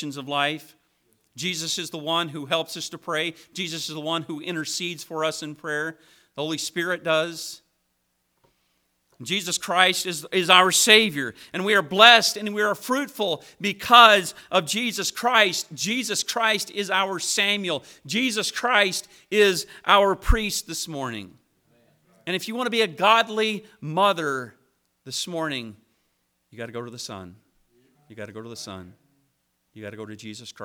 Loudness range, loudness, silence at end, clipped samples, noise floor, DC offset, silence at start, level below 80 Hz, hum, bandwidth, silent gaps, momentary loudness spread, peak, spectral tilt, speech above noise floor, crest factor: 16 LU; -22 LUFS; 0 s; under 0.1%; -73 dBFS; under 0.1%; 0 s; -42 dBFS; none; over 20 kHz; none; 21 LU; 0 dBFS; -2 dB/octave; 50 dB; 24 dB